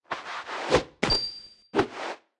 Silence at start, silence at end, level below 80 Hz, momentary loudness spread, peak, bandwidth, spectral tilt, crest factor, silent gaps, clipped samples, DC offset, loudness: 0.1 s; 0.25 s; -46 dBFS; 10 LU; -6 dBFS; 11.5 kHz; -4 dB/octave; 22 dB; none; under 0.1%; under 0.1%; -28 LUFS